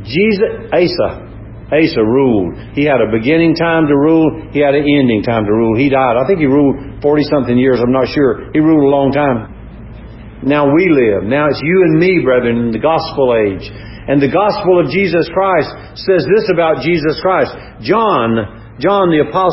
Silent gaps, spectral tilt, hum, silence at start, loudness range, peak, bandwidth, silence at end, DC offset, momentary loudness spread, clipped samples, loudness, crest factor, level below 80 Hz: none; -11 dB/octave; none; 0 s; 2 LU; 0 dBFS; 5.8 kHz; 0 s; under 0.1%; 9 LU; under 0.1%; -12 LUFS; 12 dB; -38 dBFS